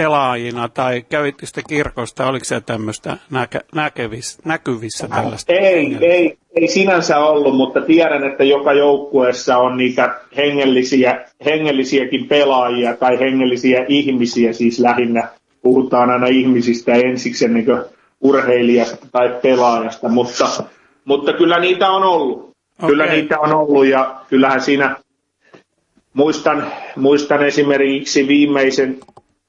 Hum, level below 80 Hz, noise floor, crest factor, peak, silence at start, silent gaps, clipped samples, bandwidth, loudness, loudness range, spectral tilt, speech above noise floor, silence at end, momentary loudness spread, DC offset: none; -54 dBFS; -61 dBFS; 14 dB; -2 dBFS; 0 s; none; under 0.1%; 11.5 kHz; -15 LUFS; 6 LU; -5 dB/octave; 46 dB; 0.5 s; 9 LU; under 0.1%